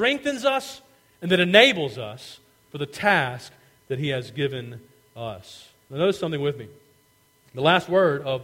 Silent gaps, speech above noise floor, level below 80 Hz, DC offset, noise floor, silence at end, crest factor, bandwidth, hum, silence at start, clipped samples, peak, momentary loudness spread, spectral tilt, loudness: none; 38 dB; -64 dBFS; under 0.1%; -61 dBFS; 0 s; 24 dB; 16.5 kHz; none; 0 s; under 0.1%; 0 dBFS; 23 LU; -5 dB/octave; -22 LUFS